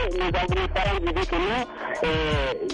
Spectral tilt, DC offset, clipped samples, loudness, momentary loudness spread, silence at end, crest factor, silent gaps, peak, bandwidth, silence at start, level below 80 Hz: -5.5 dB/octave; under 0.1%; under 0.1%; -25 LUFS; 3 LU; 0 s; 12 dB; none; -12 dBFS; 10.5 kHz; 0 s; -32 dBFS